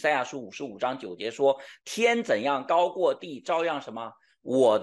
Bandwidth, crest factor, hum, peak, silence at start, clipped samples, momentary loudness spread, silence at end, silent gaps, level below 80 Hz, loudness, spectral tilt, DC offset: 12.5 kHz; 16 dB; none; -10 dBFS; 0 s; under 0.1%; 14 LU; 0 s; none; -80 dBFS; -27 LUFS; -4 dB/octave; under 0.1%